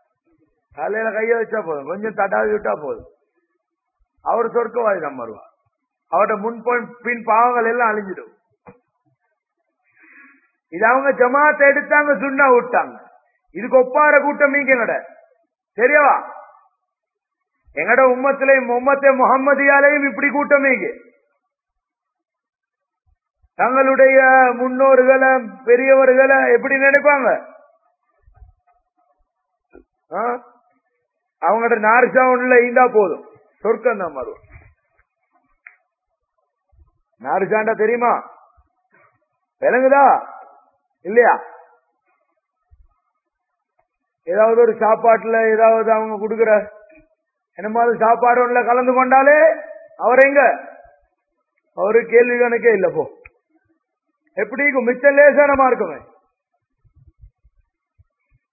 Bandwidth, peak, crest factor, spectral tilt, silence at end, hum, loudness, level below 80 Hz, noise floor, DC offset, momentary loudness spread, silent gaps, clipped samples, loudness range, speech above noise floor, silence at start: 2.7 kHz; 0 dBFS; 18 dB; -10 dB/octave; 2.55 s; none; -15 LUFS; -60 dBFS; -82 dBFS; under 0.1%; 15 LU; none; under 0.1%; 10 LU; 67 dB; 0.75 s